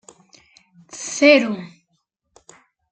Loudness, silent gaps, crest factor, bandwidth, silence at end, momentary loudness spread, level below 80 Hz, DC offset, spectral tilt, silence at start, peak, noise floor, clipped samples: -16 LUFS; none; 20 dB; 9.4 kHz; 1.25 s; 20 LU; -72 dBFS; under 0.1%; -3 dB/octave; 0.95 s; -2 dBFS; -71 dBFS; under 0.1%